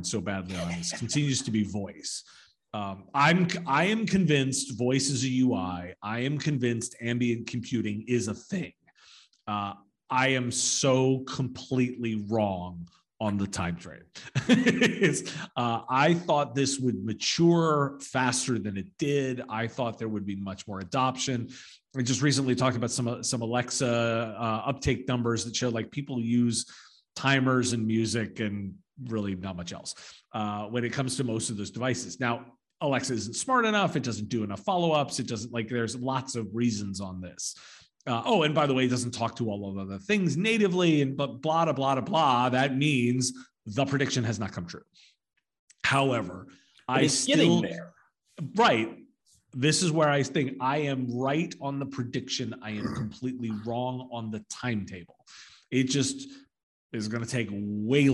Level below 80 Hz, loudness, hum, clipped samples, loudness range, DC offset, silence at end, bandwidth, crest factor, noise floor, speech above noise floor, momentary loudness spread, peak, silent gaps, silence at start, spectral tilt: -64 dBFS; -28 LUFS; none; under 0.1%; 6 LU; under 0.1%; 0 s; 12 kHz; 20 dB; -62 dBFS; 34 dB; 13 LU; -8 dBFS; 45.59-45.68 s, 56.63-56.90 s; 0 s; -4.5 dB/octave